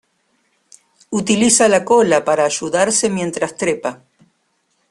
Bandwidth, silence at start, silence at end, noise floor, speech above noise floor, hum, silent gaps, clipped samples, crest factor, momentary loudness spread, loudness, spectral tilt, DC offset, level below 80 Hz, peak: 12.5 kHz; 1.1 s; 0.95 s; -65 dBFS; 50 dB; none; none; under 0.1%; 18 dB; 11 LU; -15 LUFS; -3 dB/octave; under 0.1%; -56 dBFS; 0 dBFS